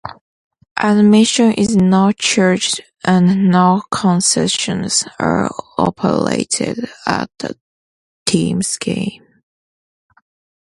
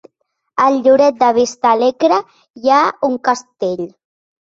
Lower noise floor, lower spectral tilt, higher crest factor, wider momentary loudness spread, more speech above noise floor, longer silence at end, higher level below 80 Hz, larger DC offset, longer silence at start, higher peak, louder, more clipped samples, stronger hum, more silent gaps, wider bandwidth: first, under -90 dBFS vs -70 dBFS; about the same, -4.5 dB/octave vs -4 dB/octave; about the same, 16 dB vs 14 dB; about the same, 10 LU vs 10 LU; first, over 76 dB vs 56 dB; first, 1.45 s vs 0.6 s; first, -50 dBFS vs -62 dBFS; neither; second, 0.05 s vs 0.55 s; about the same, 0 dBFS vs -2 dBFS; about the same, -15 LUFS vs -14 LUFS; neither; neither; first, 0.21-0.51 s, 0.71-0.76 s, 7.61-8.26 s vs 2.50-2.54 s; first, 11.5 kHz vs 7.8 kHz